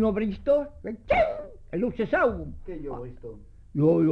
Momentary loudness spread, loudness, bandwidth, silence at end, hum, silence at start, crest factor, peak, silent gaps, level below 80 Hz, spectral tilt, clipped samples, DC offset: 15 LU; -26 LUFS; 6.4 kHz; 0 s; none; 0 s; 16 dB; -10 dBFS; none; -44 dBFS; -9.5 dB/octave; under 0.1%; under 0.1%